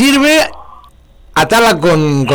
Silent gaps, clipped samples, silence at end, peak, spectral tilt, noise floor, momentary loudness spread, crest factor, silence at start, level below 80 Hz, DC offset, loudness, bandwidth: none; under 0.1%; 0 s; -4 dBFS; -4.5 dB/octave; -41 dBFS; 8 LU; 6 dB; 0 s; -38 dBFS; under 0.1%; -10 LUFS; over 20 kHz